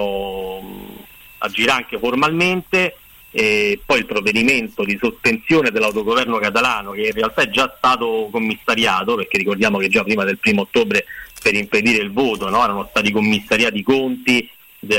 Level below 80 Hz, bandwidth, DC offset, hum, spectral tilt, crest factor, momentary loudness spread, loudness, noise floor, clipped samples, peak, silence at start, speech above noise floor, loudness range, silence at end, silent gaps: -48 dBFS; 16.5 kHz; under 0.1%; none; -4 dB/octave; 14 dB; 7 LU; -17 LUFS; -40 dBFS; under 0.1%; -6 dBFS; 0 s; 23 dB; 1 LU; 0 s; none